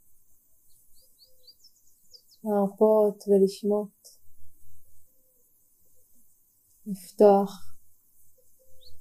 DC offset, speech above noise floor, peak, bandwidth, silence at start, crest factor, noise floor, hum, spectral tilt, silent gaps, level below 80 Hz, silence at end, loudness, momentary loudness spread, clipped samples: under 0.1%; 41 dB; -6 dBFS; 15.5 kHz; 0.9 s; 22 dB; -64 dBFS; none; -7.5 dB/octave; none; -66 dBFS; 0 s; -24 LUFS; 20 LU; under 0.1%